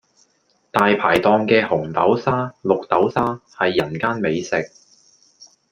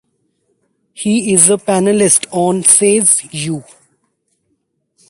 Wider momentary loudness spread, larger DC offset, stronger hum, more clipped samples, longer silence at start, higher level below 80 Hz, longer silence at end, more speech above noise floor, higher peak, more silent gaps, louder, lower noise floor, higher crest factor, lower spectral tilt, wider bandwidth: second, 8 LU vs 13 LU; neither; neither; second, under 0.1% vs 0.1%; second, 0.75 s vs 1 s; about the same, -56 dBFS vs -58 dBFS; second, 0.25 s vs 1.45 s; second, 45 dB vs 54 dB; about the same, -2 dBFS vs 0 dBFS; neither; second, -19 LUFS vs -11 LUFS; about the same, -63 dBFS vs -66 dBFS; about the same, 18 dB vs 14 dB; first, -6 dB/octave vs -3.5 dB/octave; about the same, 15.5 kHz vs 16 kHz